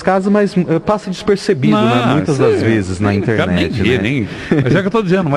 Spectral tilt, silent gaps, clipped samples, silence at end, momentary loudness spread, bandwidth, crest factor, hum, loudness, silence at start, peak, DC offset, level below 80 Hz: -7 dB/octave; none; under 0.1%; 0 s; 5 LU; 11.5 kHz; 12 dB; none; -14 LUFS; 0 s; -2 dBFS; under 0.1%; -36 dBFS